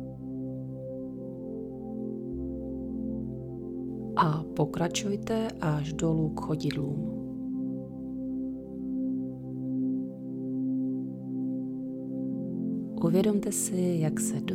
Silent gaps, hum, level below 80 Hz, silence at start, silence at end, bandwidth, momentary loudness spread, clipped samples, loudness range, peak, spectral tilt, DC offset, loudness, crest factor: none; none; -54 dBFS; 0 s; 0 s; 16.5 kHz; 11 LU; under 0.1%; 7 LU; -12 dBFS; -6 dB/octave; under 0.1%; -32 LUFS; 18 dB